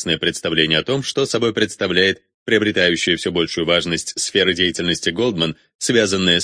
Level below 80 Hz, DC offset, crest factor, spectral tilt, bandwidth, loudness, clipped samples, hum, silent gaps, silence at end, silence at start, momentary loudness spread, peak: -50 dBFS; under 0.1%; 18 dB; -3.5 dB/octave; 10.5 kHz; -18 LUFS; under 0.1%; none; 2.34-2.46 s, 5.75-5.79 s; 0 s; 0 s; 5 LU; 0 dBFS